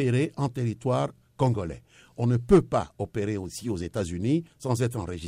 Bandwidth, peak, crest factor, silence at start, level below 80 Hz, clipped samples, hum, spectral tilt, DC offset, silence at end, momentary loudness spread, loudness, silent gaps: 15.5 kHz; -6 dBFS; 20 dB; 0 s; -48 dBFS; under 0.1%; none; -7 dB/octave; under 0.1%; 0 s; 12 LU; -27 LUFS; none